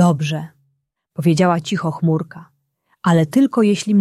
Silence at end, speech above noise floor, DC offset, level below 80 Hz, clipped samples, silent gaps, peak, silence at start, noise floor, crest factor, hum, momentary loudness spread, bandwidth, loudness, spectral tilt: 0 s; 52 dB; under 0.1%; -60 dBFS; under 0.1%; none; -2 dBFS; 0 s; -68 dBFS; 16 dB; none; 13 LU; 13 kHz; -17 LUFS; -6.5 dB/octave